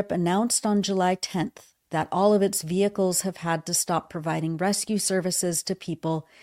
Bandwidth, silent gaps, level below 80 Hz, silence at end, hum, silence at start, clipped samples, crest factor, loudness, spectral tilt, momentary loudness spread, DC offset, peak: 16.5 kHz; none; -64 dBFS; 0.2 s; none; 0 s; under 0.1%; 16 dB; -25 LUFS; -4 dB/octave; 8 LU; under 0.1%; -10 dBFS